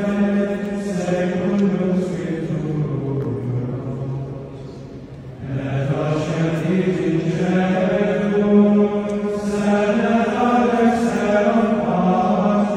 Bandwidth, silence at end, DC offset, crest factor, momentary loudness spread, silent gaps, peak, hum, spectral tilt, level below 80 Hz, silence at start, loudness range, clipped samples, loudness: 10 kHz; 0 s; under 0.1%; 16 dB; 11 LU; none; -4 dBFS; none; -7.5 dB/octave; -46 dBFS; 0 s; 8 LU; under 0.1%; -19 LUFS